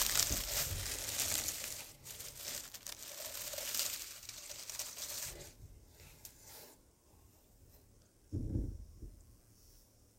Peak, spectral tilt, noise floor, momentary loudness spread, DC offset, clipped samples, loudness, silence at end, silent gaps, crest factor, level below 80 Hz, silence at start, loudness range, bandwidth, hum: -8 dBFS; -1.5 dB/octave; -66 dBFS; 20 LU; under 0.1%; under 0.1%; -39 LUFS; 0.15 s; none; 34 dB; -54 dBFS; 0 s; 10 LU; 17 kHz; none